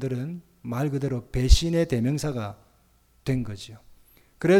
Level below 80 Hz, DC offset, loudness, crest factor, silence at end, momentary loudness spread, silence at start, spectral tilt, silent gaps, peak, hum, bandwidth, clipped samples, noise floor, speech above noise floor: -30 dBFS; under 0.1%; -27 LUFS; 22 dB; 0 s; 16 LU; 0 s; -6 dB/octave; none; -4 dBFS; none; 15.5 kHz; under 0.1%; -61 dBFS; 37 dB